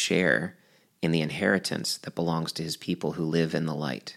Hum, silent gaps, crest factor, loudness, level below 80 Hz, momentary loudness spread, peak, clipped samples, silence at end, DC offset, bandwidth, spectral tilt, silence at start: none; none; 20 dB; -28 LUFS; -64 dBFS; 7 LU; -8 dBFS; under 0.1%; 0 s; under 0.1%; 15.5 kHz; -4.5 dB/octave; 0 s